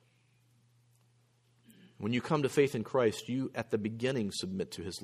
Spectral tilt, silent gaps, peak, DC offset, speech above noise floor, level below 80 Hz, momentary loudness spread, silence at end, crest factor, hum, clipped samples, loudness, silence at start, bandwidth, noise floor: -5.5 dB/octave; none; -14 dBFS; under 0.1%; 37 dB; -70 dBFS; 8 LU; 0 s; 20 dB; none; under 0.1%; -33 LUFS; 2 s; 15.5 kHz; -69 dBFS